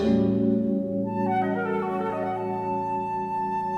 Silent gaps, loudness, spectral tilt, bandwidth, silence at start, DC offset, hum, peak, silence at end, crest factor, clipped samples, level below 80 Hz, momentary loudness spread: none; -26 LUFS; -9 dB/octave; 6.6 kHz; 0 s; under 0.1%; none; -10 dBFS; 0 s; 14 dB; under 0.1%; -54 dBFS; 6 LU